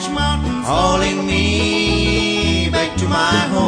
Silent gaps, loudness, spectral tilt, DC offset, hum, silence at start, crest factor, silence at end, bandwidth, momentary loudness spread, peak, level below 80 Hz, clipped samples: none; -16 LUFS; -4.5 dB/octave; under 0.1%; none; 0 s; 14 dB; 0 s; 10.5 kHz; 3 LU; -2 dBFS; -26 dBFS; under 0.1%